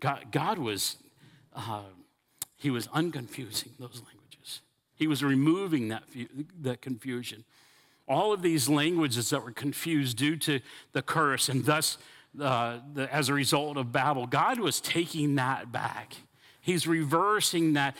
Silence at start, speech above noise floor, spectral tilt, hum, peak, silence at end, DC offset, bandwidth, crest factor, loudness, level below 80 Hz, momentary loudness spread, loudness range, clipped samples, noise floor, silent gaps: 0 s; 30 dB; -4 dB/octave; none; -12 dBFS; 0 s; under 0.1%; 17 kHz; 18 dB; -29 LUFS; -76 dBFS; 16 LU; 6 LU; under 0.1%; -59 dBFS; none